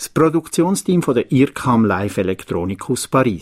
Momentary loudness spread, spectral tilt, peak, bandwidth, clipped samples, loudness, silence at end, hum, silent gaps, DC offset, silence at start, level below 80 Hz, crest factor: 7 LU; -6 dB/octave; -2 dBFS; 16 kHz; under 0.1%; -18 LUFS; 0 s; none; none; under 0.1%; 0 s; -48 dBFS; 14 dB